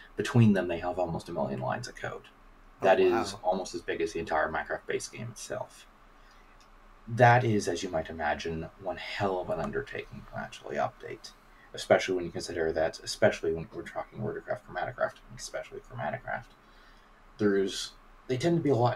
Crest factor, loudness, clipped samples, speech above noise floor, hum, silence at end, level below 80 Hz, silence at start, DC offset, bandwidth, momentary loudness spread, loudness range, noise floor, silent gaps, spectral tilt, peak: 22 dB; -30 LUFS; under 0.1%; 26 dB; none; 0 s; -56 dBFS; 0 s; under 0.1%; 13 kHz; 16 LU; 7 LU; -56 dBFS; none; -5.5 dB/octave; -8 dBFS